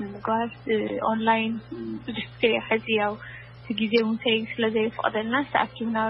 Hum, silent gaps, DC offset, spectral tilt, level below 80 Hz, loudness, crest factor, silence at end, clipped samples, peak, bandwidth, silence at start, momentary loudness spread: none; none; under 0.1%; -8.5 dB/octave; -58 dBFS; -25 LUFS; 20 dB; 0 s; under 0.1%; -6 dBFS; 5.8 kHz; 0 s; 11 LU